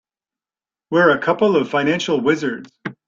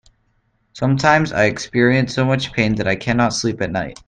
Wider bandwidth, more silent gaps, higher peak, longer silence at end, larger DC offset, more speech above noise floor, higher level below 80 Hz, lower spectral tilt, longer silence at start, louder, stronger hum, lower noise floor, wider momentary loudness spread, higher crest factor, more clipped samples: second, 7.6 kHz vs 9.6 kHz; neither; about the same, -2 dBFS vs 0 dBFS; about the same, 0.15 s vs 0.15 s; neither; first, over 73 dB vs 46 dB; second, -62 dBFS vs -44 dBFS; about the same, -5.5 dB/octave vs -5.5 dB/octave; first, 0.9 s vs 0.75 s; about the same, -17 LUFS vs -17 LUFS; neither; first, under -90 dBFS vs -64 dBFS; first, 11 LU vs 6 LU; about the same, 16 dB vs 18 dB; neither